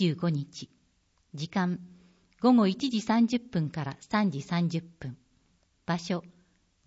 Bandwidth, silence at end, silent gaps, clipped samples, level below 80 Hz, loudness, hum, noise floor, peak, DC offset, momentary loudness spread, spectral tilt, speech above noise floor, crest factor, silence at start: 8 kHz; 0.6 s; none; under 0.1%; -66 dBFS; -29 LUFS; none; -70 dBFS; -12 dBFS; under 0.1%; 19 LU; -6.5 dB/octave; 42 dB; 18 dB; 0 s